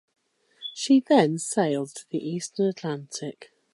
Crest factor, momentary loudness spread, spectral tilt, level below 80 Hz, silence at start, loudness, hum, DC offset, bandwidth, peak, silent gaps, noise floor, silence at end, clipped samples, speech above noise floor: 20 dB; 16 LU; -5 dB/octave; -78 dBFS; 0.6 s; -25 LUFS; none; under 0.1%; 11.5 kHz; -6 dBFS; none; -45 dBFS; 0.3 s; under 0.1%; 21 dB